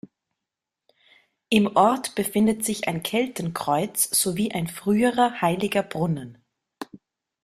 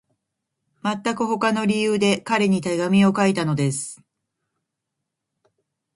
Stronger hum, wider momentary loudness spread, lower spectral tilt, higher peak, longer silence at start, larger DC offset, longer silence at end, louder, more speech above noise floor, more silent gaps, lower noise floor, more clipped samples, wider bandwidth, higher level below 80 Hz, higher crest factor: neither; about the same, 11 LU vs 9 LU; second, -4 dB/octave vs -5.5 dB/octave; about the same, -4 dBFS vs -6 dBFS; first, 1.5 s vs 0.85 s; neither; second, 0.6 s vs 2 s; about the same, -23 LUFS vs -21 LUFS; about the same, 63 dB vs 61 dB; neither; first, -86 dBFS vs -81 dBFS; neither; first, 15.5 kHz vs 11.5 kHz; about the same, -60 dBFS vs -64 dBFS; about the same, 20 dB vs 18 dB